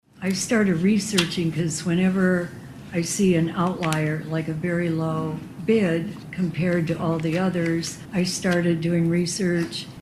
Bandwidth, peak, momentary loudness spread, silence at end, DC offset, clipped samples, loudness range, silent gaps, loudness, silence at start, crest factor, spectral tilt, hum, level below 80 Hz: 13.5 kHz; -2 dBFS; 8 LU; 0 s; under 0.1%; under 0.1%; 2 LU; none; -23 LUFS; 0.15 s; 20 dB; -5.5 dB/octave; none; -54 dBFS